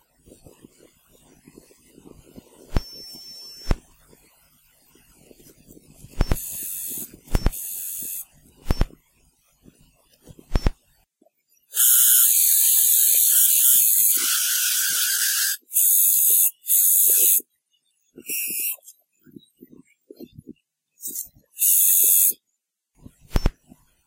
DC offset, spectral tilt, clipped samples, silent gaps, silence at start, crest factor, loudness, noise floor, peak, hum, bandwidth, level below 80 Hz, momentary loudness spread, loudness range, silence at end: under 0.1%; -1 dB/octave; under 0.1%; none; 2.7 s; 20 dB; -17 LUFS; -78 dBFS; -4 dBFS; none; 16.5 kHz; -34 dBFS; 19 LU; 21 LU; 0.55 s